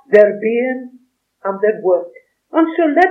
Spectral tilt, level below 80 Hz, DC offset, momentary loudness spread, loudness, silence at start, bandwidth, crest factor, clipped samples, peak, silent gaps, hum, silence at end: -7.5 dB/octave; -64 dBFS; under 0.1%; 14 LU; -16 LUFS; 0.1 s; 6.6 kHz; 16 dB; 0.1%; 0 dBFS; none; none; 0 s